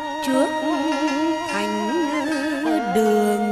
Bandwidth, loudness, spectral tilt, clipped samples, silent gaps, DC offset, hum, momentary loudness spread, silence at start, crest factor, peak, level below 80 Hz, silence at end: 14 kHz; -21 LUFS; -4.5 dB/octave; under 0.1%; none; under 0.1%; none; 4 LU; 0 s; 14 dB; -8 dBFS; -58 dBFS; 0 s